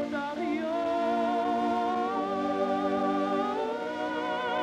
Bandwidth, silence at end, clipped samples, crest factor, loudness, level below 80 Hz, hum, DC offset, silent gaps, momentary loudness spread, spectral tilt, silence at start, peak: 11 kHz; 0 s; under 0.1%; 12 dB; -29 LUFS; -66 dBFS; none; under 0.1%; none; 4 LU; -5.5 dB/octave; 0 s; -16 dBFS